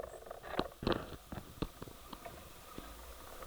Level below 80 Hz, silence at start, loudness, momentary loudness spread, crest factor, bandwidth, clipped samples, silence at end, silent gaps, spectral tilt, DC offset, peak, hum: -54 dBFS; 0 s; -44 LUFS; 13 LU; 30 dB; over 20 kHz; under 0.1%; 0 s; none; -5 dB/octave; under 0.1%; -14 dBFS; none